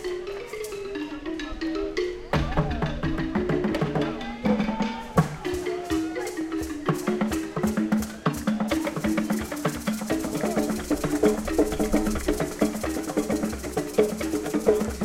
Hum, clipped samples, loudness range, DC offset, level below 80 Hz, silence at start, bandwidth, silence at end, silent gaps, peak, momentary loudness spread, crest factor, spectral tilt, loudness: none; under 0.1%; 2 LU; under 0.1%; -40 dBFS; 0 s; 16.5 kHz; 0 s; none; -6 dBFS; 6 LU; 20 dB; -5.5 dB/octave; -27 LUFS